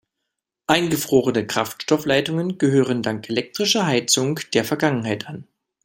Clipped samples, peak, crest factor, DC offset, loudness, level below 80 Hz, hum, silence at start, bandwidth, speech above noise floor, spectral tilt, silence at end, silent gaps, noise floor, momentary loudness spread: under 0.1%; 0 dBFS; 20 dB; under 0.1%; -20 LUFS; -60 dBFS; none; 0.7 s; 16.5 kHz; 60 dB; -4 dB/octave; 0.45 s; none; -81 dBFS; 7 LU